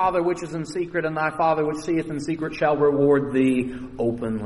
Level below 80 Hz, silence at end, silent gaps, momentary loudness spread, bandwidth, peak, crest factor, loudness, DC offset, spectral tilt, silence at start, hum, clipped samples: -50 dBFS; 0 s; none; 9 LU; 11.5 kHz; -8 dBFS; 14 dB; -23 LUFS; under 0.1%; -7 dB/octave; 0 s; none; under 0.1%